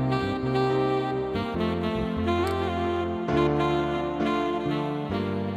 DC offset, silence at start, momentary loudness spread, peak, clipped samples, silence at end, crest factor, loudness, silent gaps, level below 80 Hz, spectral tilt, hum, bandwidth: under 0.1%; 0 s; 4 LU; -12 dBFS; under 0.1%; 0 s; 14 dB; -26 LUFS; none; -44 dBFS; -7.5 dB/octave; none; 13 kHz